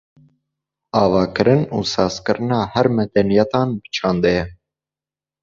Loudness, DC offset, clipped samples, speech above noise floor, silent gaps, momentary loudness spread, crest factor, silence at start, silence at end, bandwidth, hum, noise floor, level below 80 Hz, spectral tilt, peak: -18 LUFS; under 0.1%; under 0.1%; over 73 dB; none; 6 LU; 18 dB; 0.95 s; 0.9 s; 7.6 kHz; none; under -90 dBFS; -46 dBFS; -6.5 dB/octave; 0 dBFS